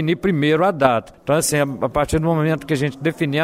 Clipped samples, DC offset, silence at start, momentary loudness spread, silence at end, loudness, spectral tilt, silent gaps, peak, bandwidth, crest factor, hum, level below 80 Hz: under 0.1%; under 0.1%; 0 s; 6 LU; 0 s; -19 LUFS; -5.5 dB/octave; none; 0 dBFS; 16 kHz; 18 dB; none; -40 dBFS